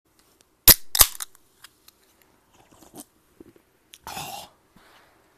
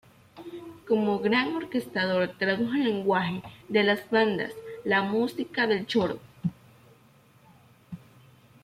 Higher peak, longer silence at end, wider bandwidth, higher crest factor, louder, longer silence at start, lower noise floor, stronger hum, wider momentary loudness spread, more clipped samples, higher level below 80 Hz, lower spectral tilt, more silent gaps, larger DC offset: first, 0 dBFS vs -10 dBFS; first, 1 s vs 0.65 s; about the same, 14.5 kHz vs 15 kHz; first, 26 dB vs 18 dB; first, -16 LUFS vs -27 LUFS; first, 0.65 s vs 0.35 s; about the same, -61 dBFS vs -58 dBFS; neither; first, 24 LU vs 18 LU; neither; first, -40 dBFS vs -68 dBFS; second, -0.5 dB/octave vs -6.5 dB/octave; neither; neither